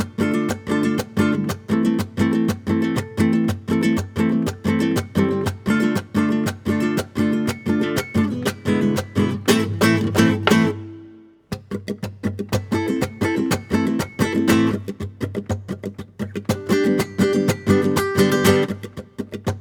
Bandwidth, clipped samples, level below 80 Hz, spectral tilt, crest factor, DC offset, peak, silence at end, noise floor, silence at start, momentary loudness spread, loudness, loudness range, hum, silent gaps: over 20 kHz; under 0.1%; -48 dBFS; -6 dB/octave; 20 dB; under 0.1%; 0 dBFS; 0 s; -45 dBFS; 0 s; 12 LU; -21 LUFS; 3 LU; none; none